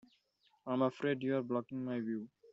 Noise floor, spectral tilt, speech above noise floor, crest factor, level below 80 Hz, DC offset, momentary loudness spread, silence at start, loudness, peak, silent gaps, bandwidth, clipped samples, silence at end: -75 dBFS; -6 dB/octave; 39 dB; 18 dB; -82 dBFS; under 0.1%; 8 LU; 0.65 s; -37 LUFS; -20 dBFS; none; 7.6 kHz; under 0.1%; 0.05 s